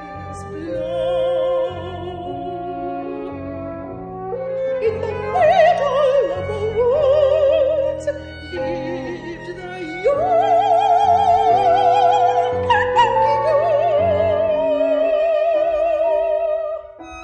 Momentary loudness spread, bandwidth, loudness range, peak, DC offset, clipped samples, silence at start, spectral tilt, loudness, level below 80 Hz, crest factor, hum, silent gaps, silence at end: 15 LU; 9.2 kHz; 9 LU; -4 dBFS; under 0.1%; under 0.1%; 0 s; -6 dB/octave; -18 LUFS; -46 dBFS; 14 dB; none; none; 0 s